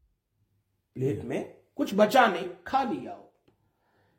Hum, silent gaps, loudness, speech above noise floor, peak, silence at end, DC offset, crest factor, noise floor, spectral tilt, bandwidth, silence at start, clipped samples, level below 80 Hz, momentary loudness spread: none; none; -27 LUFS; 48 dB; -8 dBFS; 0.95 s; under 0.1%; 22 dB; -74 dBFS; -5.5 dB/octave; 16.5 kHz; 0.95 s; under 0.1%; -68 dBFS; 21 LU